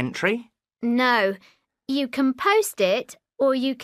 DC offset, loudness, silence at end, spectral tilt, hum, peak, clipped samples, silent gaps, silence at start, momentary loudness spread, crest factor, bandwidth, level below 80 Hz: under 0.1%; -23 LUFS; 0 s; -4 dB/octave; none; -6 dBFS; under 0.1%; none; 0 s; 11 LU; 16 dB; 15.5 kHz; -70 dBFS